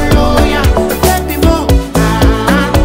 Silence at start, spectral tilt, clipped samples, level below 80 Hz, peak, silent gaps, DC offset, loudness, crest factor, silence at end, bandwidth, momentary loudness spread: 0 s; -5.5 dB/octave; under 0.1%; -14 dBFS; 0 dBFS; none; under 0.1%; -11 LUFS; 10 dB; 0 s; 16.5 kHz; 2 LU